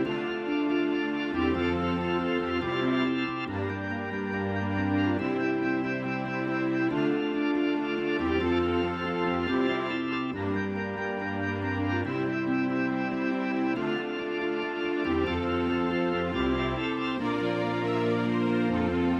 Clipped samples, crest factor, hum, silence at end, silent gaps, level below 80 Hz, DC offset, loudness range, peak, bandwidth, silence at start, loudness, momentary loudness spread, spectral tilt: under 0.1%; 14 dB; none; 0 s; none; -50 dBFS; under 0.1%; 2 LU; -14 dBFS; 7.4 kHz; 0 s; -28 LUFS; 4 LU; -7.5 dB/octave